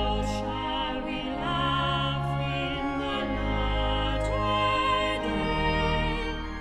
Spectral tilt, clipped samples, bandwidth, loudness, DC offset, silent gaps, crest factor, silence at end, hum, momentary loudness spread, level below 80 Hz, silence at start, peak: -6 dB/octave; under 0.1%; 11 kHz; -28 LUFS; under 0.1%; none; 14 dB; 0 s; none; 6 LU; -34 dBFS; 0 s; -14 dBFS